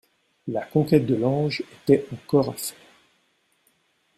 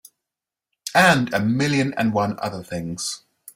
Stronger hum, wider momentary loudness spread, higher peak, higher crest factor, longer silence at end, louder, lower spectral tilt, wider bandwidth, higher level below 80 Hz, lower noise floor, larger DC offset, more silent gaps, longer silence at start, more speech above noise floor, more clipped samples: neither; about the same, 12 LU vs 14 LU; about the same, -4 dBFS vs -2 dBFS; about the same, 20 dB vs 20 dB; first, 1.45 s vs 0.05 s; about the same, -23 LUFS vs -21 LUFS; first, -6.5 dB/octave vs -4.5 dB/octave; about the same, 15.5 kHz vs 16 kHz; about the same, -62 dBFS vs -58 dBFS; second, -67 dBFS vs -87 dBFS; neither; neither; second, 0.45 s vs 0.85 s; second, 45 dB vs 67 dB; neither